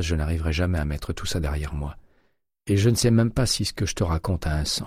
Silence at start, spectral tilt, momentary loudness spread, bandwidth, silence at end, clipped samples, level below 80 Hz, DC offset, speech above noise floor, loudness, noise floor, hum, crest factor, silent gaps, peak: 0 s; -5 dB/octave; 10 LU; 16 kHz; 0 s; under 0.1%; -32 dBFS; under 0.1%; 44 dB; -24 LUFS; -68 dBFS; none; 16 dB; none; -8 dBFS